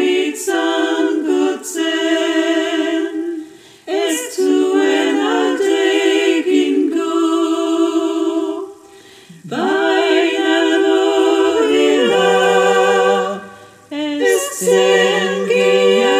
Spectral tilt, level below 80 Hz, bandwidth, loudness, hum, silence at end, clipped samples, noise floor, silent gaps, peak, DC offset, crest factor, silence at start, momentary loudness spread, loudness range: -3.5 dB/octave; -66 dBFS; 16 kHz; -15 LUFS; none; 0 s; under 0.1%; -42 dBFS; none; 0 dBFS; under 0.1%; 14 dB; 0 s; 9 LU; 4 LU